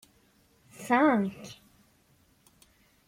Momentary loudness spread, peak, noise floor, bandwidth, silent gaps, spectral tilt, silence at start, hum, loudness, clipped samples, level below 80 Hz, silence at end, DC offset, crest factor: 23 LU; -10 dBFS; -65 dBFS; 16 kHz; none; -6 dB/octave; 0.8 s; none; -26 LUFS; under 0.1%; -70 dBFS; 1.55 s; under 0.1%; 22 dB